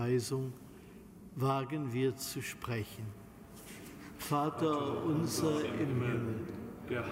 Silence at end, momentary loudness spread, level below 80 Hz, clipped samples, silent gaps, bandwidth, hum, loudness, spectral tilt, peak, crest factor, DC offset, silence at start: 0 s; 19 LU; -64 dBFS; under 0.1%; none; 16 kHz; none; -36 LUFS; -6 dB/octave; -20 dBFS; 16 dB; under 0.1%; 0 s